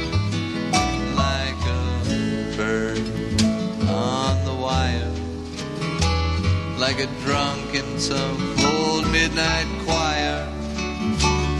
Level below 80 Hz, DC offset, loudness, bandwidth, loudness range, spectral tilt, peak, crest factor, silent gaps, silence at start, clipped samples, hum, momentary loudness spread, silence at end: -30 dBFS; under 0.1%; -22 LUFS; 12.5 kHz; 2 LU; -4.5 dB/octave; -4 dBFS; 18 dB; none; 0 s; under 0.1%; none; 7 LU; 0 s